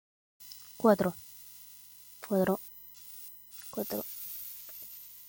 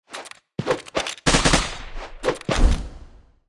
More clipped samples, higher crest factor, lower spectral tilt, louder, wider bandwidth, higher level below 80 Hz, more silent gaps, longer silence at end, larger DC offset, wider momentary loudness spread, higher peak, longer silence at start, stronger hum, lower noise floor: neither; about the same, 24 dB vs 20 dB; first, -6 dB/octave vs -3.5 dB/octave; second, -33 LUFS vs -22 LUFS; first, 17 kHz vs 12 kHz; second, -72 dBFS vs -26 dBFS; neither; second, 0 s vs 0.3 s; neither; about the same, 20 LU vs 19 LU; second, -12 dBFS vs -2 dBFS; first, 0.4 s vs 0.1 s; first, 50 Hz at -60 dBFS vs none; first, -53 dBFS vs -46 dBFS